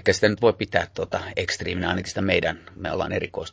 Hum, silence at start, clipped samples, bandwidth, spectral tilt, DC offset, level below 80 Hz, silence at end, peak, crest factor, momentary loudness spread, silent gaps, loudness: none; 0.05 s; under 0.1%; 8 kHz; -4.5 dB/octave; under 0.1%; -44 dBFS; 0 s; -4 dBFS; 22 dB; 8 LU; none; -24 LUFS